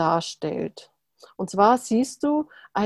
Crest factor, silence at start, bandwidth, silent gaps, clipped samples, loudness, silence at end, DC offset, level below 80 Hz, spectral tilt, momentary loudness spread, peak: 20 dB; 0 s; 12.5 kHz; none; under 0.1%; -24 LUFS; 0 s; under 0.1%; -62 dBFS; -5 dB/octave; 12 LU; -4 dBFS